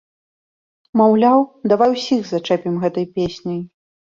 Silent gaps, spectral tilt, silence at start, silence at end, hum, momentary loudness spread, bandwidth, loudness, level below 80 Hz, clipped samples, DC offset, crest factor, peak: none; -7 dB/octave; 0.95 s; 0.45 s; none; 13 LU; 7.4 kHz; -17 LUFS; -56 dBFS; under 0.1%; under 0.1%; 16 dB; -2 dBFS